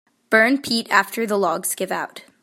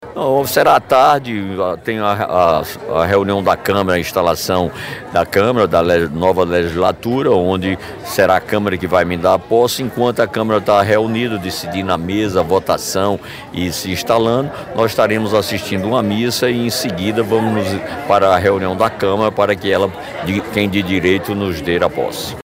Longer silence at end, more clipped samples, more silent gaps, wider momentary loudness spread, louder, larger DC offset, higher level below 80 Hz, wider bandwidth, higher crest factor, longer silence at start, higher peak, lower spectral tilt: first, 0.25 s vs 0 s; neither; neither; first, 10 LU vs 7 LU; second, -19 LUFS vs -15 LUFS; neither; second, -70 dBFS vs -48 dBFS; about the same, 16.5 kHz vs 16 kHz; first, 20 dB vs 14 dB; first, 0.3 s vs 0 s; about the same, -2 dBFS vs -2 dBFS; second, -2.5 dB/octave vs -5 dB/octave